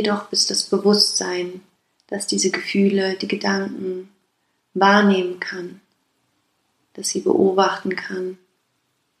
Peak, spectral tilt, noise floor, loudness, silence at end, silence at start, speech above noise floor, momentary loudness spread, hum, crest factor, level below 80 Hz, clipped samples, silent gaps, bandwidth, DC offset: -2 dBFS; -3.5 dB/octave; -69 dBFS; -19 LUFS; 0.85 s; 0 s; 50 dB; 15 LU; none; 20 dB; -72 dBFS; under 0.1%; none; 13 kHz; under 0.1%